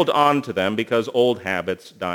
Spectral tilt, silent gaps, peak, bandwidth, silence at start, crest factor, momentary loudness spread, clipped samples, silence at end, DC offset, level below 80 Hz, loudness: -5.5 dB/octave; none; -4 dBFS; 19.5 kHz; 0 s; 18 dB; 8 LU; under 0.1%; 0 s; under 0.1%; -64 dBFS; -21 LUFS